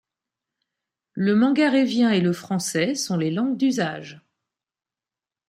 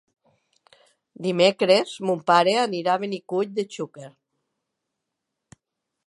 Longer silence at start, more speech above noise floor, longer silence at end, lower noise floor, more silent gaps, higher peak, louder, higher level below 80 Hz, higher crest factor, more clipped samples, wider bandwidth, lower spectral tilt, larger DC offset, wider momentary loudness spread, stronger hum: about the same, 1.15 s vs 1.2 s; first, over 69 dB vs 60 dB; second, 1.3 s vs 2 s; first, under -90 dBFS vs -82 dBFS; neither; second, -8 dBFS vs -4 dBFS; about the same, -22 LUFS vs -22 LUFS; first, -70 dBFS vs -78 dBFS; second, 16 dB vs 22 dB; neither; first, 15 kHz vs 11.5 kHz; about the same, -5 dB/octave vs -4.5 dB/octave; neither; second, 9 LU vs 13 LU; neither